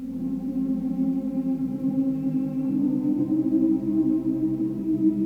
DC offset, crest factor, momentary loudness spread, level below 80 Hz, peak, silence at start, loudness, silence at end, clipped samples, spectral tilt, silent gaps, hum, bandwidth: under 0.1%; 12 dB; 4 LU; -54 dBFS; -12 dBFS; 0 s; -25 LUFS; 0 s; under 0.1%; -10.5 dB/octave; none; none; 3 kHz